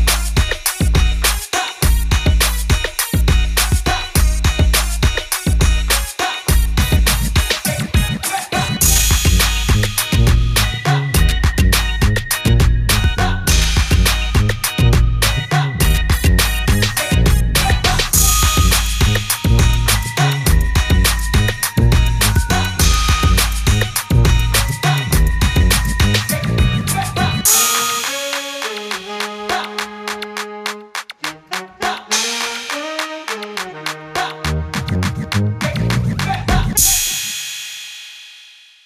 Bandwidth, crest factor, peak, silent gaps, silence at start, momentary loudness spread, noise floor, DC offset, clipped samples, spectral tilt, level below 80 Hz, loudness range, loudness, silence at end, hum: 16 kHz; 14 dB; 0 dBFS; none; 0 s; 10 LU; -43 dBFS; under 0.1%; under 0.1%; -3.5 dB/octave; -18 dBFS; 7 LU; -16 LUFS; 0.45 s; none